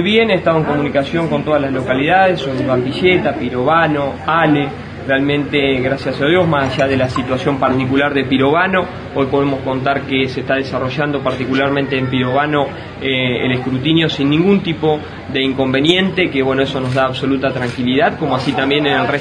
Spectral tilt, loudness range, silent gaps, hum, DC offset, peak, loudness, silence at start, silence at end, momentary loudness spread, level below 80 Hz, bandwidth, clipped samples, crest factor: -6.5 dB/octave; 2 LU; none; none; under 0.1%; 0 dBFS; -15 LUFS; 0 s; 0 s; 5 LU; -44 dBFS; 10.5 kHz; under 0.1%; 14 dB